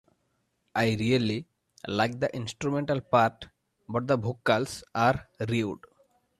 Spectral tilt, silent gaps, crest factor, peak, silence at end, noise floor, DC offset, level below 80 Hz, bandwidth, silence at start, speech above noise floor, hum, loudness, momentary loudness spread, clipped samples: -6 dB/octave; none; 20 dB; -8 dBFS; 0.6 s; -75 dBFS; under 0.1%; -60 dBFS; 14 kHz; 0.75 s; 48 dB; none; -28 LUFS; 10 LU; under 0.1%